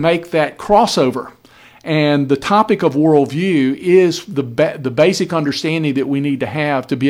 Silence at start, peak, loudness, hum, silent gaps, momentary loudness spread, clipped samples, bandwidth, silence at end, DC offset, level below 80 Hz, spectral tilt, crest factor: 0 s; 0 dBFS; -15 LUFS; none; none; 6 LU; under 0.1%; 16 kHz; 0 s; under 0.1%; -50 dBFS; -6 dB/octave; 14 dB